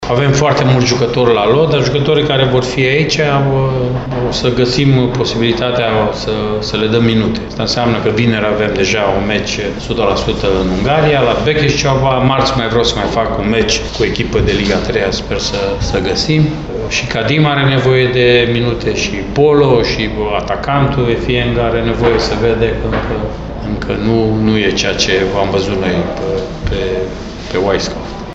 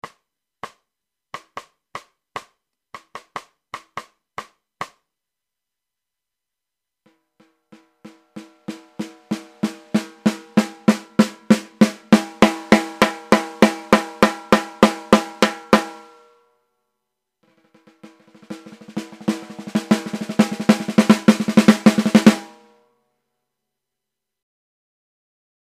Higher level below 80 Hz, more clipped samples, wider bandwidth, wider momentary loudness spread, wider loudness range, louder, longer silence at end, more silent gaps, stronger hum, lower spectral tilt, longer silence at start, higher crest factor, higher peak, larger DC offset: first, -28 dBFS vs -56 dBFS; neither; second, 8 kHz vs 15 kHz; second, 6 LU vs 23 LU; second, 3 LU vs 22 LU; first, -13 LUFS vs -18 LUFS; second, 0 s vs 3.25 s; neither; neither; about the same, -5.5 dB/octave vs -5.5 dB/octave; about the same, 0 s vs 0.05 s; second, 12 dB vs 22 dB; about the same, 0 dBFS vs 0 dBFS; neither